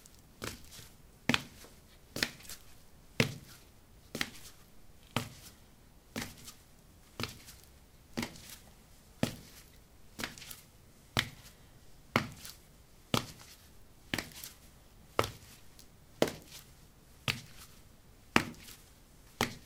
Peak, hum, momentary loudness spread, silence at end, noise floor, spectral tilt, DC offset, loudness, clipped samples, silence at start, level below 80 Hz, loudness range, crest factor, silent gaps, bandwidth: -4 dBFS; none; 26 LU; 0 s; -59 dBFS; -3.5 dB/octave; under 0.1%; -38 LUFS; under 0.1%; 0 s; -60 dBFS; 7 LU; 38 dB; none; 18 kHz